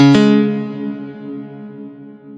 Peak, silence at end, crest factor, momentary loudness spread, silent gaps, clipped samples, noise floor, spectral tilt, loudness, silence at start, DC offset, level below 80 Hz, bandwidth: 0 dBFS; 0 s; 16 dB; 23 LU; none; under 0.1%; -35 dBFS; -7 dB/octave; -14 LUFS; 0 s; under 0.1%; -58 dBFS; 8.2 kHz